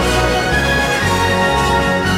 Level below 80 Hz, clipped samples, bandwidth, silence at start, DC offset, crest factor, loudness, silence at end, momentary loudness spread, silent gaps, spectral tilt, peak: -26 dBFS; under 0.1%; 16.5 kHz; 0 s; under 0.1%; 10 dB; -14 LUFS; 0 s; 1 LU; none; -4.5 dB/octave; -4 dBFS